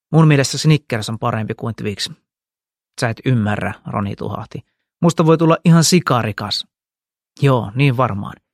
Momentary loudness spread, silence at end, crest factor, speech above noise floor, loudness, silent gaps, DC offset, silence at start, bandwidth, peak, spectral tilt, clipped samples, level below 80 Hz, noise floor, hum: 14 LU; 0.2 s; 16 dB; over 74 dB; -17 LUFS; none; under 0.1%; 0.1 s; 14 kHz; 0 dBFS; -5.5 dB/octave; under 0.1%; -52 dBFS; under -90 dBFS; none